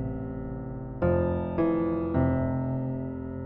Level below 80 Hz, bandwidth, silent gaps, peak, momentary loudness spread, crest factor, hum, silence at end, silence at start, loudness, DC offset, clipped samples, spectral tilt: -44 dBFS; 4 kHz; none; -12 dBFS; 10 LU; 16 dB; none; 0 s; 0 s; -29 LUFS; under 0.1%; under 0.1%; -10 dB/octave